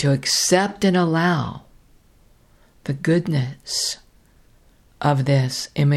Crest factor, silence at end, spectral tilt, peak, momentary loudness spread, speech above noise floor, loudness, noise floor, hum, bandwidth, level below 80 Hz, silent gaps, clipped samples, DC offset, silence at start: 20 dB; 0 s; -4.5 dB/octave; -2 dBFS; 12 LU; 35 dB; -20 LUFS; -54 dBFS; none; 15 kHz; -54 dBFS; none; under 0.1%; under 0.1%; 0 s